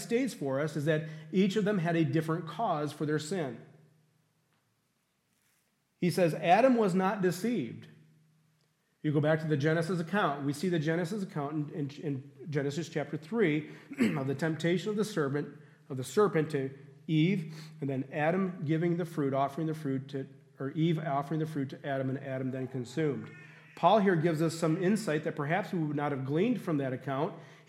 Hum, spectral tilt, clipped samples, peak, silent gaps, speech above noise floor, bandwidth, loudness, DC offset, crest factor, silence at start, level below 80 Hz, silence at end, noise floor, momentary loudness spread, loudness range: none; -7 dB/octave; under 0.1%; -12 dBFS; none; 46 dB; 15 kHz; -31 LUFS; under 0.1%; 20 dB; 0 s; -80 dBFS; 0.1 s; -76 dBFS; 10 LU; 4 LU